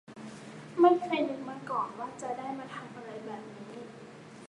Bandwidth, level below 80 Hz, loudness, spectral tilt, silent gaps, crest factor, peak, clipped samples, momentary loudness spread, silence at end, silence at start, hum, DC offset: 11 kHz; -78 dBFS; -31 LUFS; -6 dB/octave; none; 22 dB; -12 dBFS; under 0.1%; 22 LU; 0 s; 0.1 s; none; under 0.1%